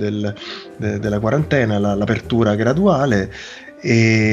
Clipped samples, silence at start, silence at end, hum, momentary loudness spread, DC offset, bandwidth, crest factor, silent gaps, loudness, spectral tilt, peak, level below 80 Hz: under 0.1%; 0 s; 0 s; none; 13 LU; under 0.1%; 7.6 kHz; 16 dB; none; -18 LUFS; -6.5 dB/octave; 0 dBFS; -42 dBFS